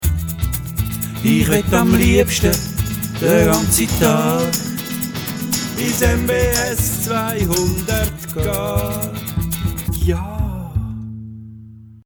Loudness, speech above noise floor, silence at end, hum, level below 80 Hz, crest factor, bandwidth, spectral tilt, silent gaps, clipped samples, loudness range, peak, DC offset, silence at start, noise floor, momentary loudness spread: -18 LUFS; 23 dB; 0.1 s; none; -28 dBFS; 18 dB; over 20 kHz; -5 dB/octave; none; under 0.1%; 7 LU; 0 dBFS; under 0.1%; 0 s; -39 dBFS; 10 LU